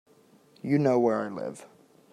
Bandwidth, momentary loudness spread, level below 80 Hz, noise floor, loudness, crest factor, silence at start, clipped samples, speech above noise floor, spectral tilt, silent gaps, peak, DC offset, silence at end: 12 kHz; 17 LU; -74 dBFS; -60 dBFS; -26 LUFS; 18 dB; 0.65 s; under 0.1%; 34 dB; -8 dB/octave; none; -12 dBFS; under 0.1%; 0.45 s